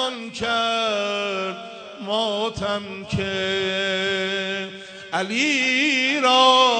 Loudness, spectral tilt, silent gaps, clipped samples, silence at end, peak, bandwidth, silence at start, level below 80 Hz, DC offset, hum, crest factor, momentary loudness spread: -21 LUFS; -3 dB/octave; none; under 0.1%; 0 s; -4 dBFS; 9.4 kHz; 0 s; -56 dBFS; under 0.1%; none; 18 dB; 12 LU